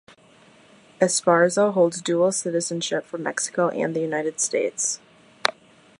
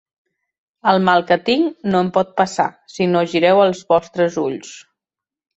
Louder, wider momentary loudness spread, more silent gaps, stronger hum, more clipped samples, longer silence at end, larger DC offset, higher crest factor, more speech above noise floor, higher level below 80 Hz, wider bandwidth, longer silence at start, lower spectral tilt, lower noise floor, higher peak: second, -23 LUFS vs -17 LUFS; about the same, 8 LU vs 8 LU; neither; neither; neither; second, 0.5 s vs 0.75 s; neither; first, 24 dB vs 16 dB; second, 31 dB vs 71 dB; second, -74 dBFS vs -60 dBFS; first, 11.5 kHz vs 8.2 kHz; first, 1 s vs 0.85 s; second, -3.5 dB/octave vs -5.5 dB/octave; second, -53 dBFS vs -88 dBFS; about the same, 0 dBFS vs -2 dBFS